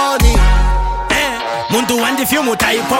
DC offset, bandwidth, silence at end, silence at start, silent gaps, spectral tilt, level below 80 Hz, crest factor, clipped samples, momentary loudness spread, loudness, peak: under 0.1%; 17 kHz; 0 s; 0 s; none; -4 dB/octave; -16 dBFS; 12 dB; under 0.1%; 5 LU; -14 LUFS; 0 dBFS